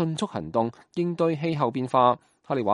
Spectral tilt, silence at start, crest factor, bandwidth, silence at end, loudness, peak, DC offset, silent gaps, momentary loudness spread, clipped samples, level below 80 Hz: -7 dB/octave; 0 s; 20 dB; 11 kHz; 0 s; -26 LUFS; -6 dBFS; under 0.1%; none; 9 LU; under 0.1%; -64 dBFS